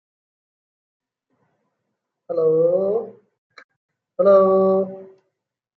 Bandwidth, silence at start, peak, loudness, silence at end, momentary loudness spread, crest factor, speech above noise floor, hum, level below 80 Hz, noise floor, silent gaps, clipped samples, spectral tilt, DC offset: 4.5 kHz; 2.3 s; -4 dBFS; -18 LUFS; 0.7 s; 21 LU; 18 dB; 62 dB; none; -72 dBFS; -78 dBFS; 3.38-3.50 s, 3.64-3.69 s, 3.76-3.89 s; under 0.1%; -10.5 dB/octave; under 0.1%